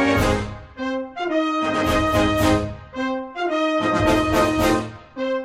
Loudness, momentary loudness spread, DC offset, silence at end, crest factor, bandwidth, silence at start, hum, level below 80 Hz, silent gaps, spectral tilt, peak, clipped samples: -21 LUFS; 10 LU; under 0.1%; 0 s; 18 dB; 16 kHz; 0 s; none; -36 dBFS; none; -5.5 dB/octave; -4 dBFS; under 0.1%